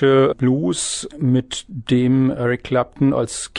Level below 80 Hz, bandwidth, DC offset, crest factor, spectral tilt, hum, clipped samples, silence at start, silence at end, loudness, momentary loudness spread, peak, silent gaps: -48 dBFS; 11 kHz; under 0.1%; 14 dB; -5.5 dB/octave; none; under 0.1%; 0 s; 0 s; -19 LUFS; 6 LU; -4 dBFS; none